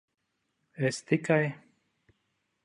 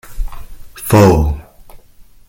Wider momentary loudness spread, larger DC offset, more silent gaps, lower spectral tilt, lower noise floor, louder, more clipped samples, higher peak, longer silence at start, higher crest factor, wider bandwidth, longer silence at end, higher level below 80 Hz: second, 8 LU vs 21 LU; neither; neither; about the same, -6 dB/octave vs -7 dB/octave; first, -80 dBFS vs -41 dBFS; second, -29 LUFS vs -11 LUFS; neither; second, -12 dBFS vs 0 dBFS; first, 0.8 s vs 0.1 s; first, 22 dB vs 16 dB; second, 11.5 kHz vs 17 kHz; first, 1.05 s vs 0.25 s; second, -74 dBFS vs -24 dBFS